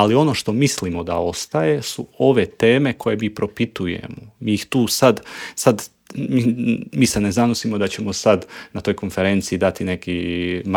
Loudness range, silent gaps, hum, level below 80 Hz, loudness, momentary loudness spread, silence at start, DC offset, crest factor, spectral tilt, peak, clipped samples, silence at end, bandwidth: 2 LU; none; none; -48 dBFS; -20 LUFS; 10 LU; 0 s; under 0.1%; 18 dB; -5 dB/octave; 0 dBFS; under 0.1%; 0 s; 18.5 kHz